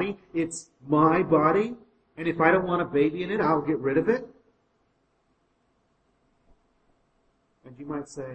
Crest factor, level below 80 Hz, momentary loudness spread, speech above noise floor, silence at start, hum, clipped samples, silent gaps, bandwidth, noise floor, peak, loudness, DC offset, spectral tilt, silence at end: 22 dB; -60 dBFS; 14 LU; 45 dB; 0 s; none; under 0.1%; none; 8.8 kHz; -70 dBFS; -6 dBFS; -25 LUFS; under 0.1%; -6.5 dB/octave; 0 s